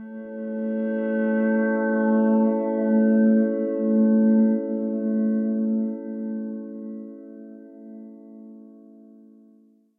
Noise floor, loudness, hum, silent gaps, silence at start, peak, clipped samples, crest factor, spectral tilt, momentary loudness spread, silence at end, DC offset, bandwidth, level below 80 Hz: -57 dBFS; -22 LUFS; none; none; 0 s; -10 dBFS; under 0.1%; 12 dB; -12 dB/octave; 24 LU; 1.3 s; under 0.1%; 2.8 kHz; -82 dBFS